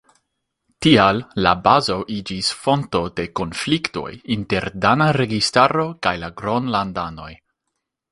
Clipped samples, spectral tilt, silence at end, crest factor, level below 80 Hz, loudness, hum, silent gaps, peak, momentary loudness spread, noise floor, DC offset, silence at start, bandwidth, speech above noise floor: under 0.1%; -5 dB/octave; 0.75 s; 20 dB; -46 dBFS; -19 LUFS; none; none; 0 dBFS; 11 LU; -78 dBFS; under 0.1%; 0.8 s; 11.5 kHz; 59 dB